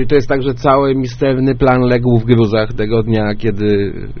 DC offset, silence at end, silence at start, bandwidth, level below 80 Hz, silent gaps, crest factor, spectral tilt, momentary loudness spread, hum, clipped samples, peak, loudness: under 0.1%; 0 s; 0 s; 6.6 kHz; -30 dBFS; none; 12 dB; -6.5 dB/octave; 5 LU; none; under 0.1%; 0 dBFS; -14 LUFS